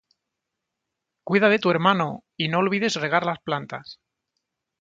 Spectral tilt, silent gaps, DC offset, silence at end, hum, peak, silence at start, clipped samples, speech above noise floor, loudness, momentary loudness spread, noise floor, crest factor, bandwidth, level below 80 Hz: -5.5 dB/octave; none; under 0.1%; 0.9 s; none; -4 dBFS; 1.25 s; under 0.1%; 61 dB; -22 LUFS; 12 LU; -83 dBFS; 20 dB; 7.8 kHz; -68 dBFS